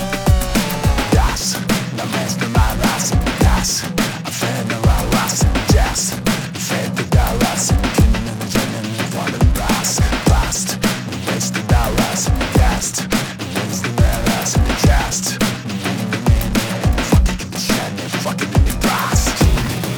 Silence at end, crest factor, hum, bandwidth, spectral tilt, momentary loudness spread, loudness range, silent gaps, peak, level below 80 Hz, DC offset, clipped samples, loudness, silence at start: 0 s; 16 dB; none; over 20 kHz; -4.5 dB/octave; 6 LU; 1 LU; none; 0 dBFS; -22 dBFS; under 0.1%; under 0.1%; -17 LUFS; 0 s